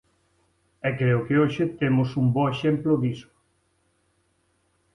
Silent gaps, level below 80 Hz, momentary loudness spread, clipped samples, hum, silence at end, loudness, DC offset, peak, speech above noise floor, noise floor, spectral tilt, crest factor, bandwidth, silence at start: none; -58 dBFS; 8 LU; under 0.1%; none; 1.75 s; -24 LUFS; under 0.1%; -10 dBFS; 46 dB; -69 dBFS; -8.5 dB/octave; 16 dB; 6.4 kHz; 0.85 s